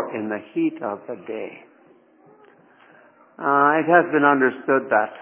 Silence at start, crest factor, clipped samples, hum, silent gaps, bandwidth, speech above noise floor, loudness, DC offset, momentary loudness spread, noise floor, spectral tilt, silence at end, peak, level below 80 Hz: 0 s; 20 dB; under 0.1%; none; none; 3.6 kHz; 34 dB; -20 LUFS; under 0.1%; 16 LU; -54 dBFS; -9.5 dB/octave; 0 s; -2 dBFS; -78 dBFS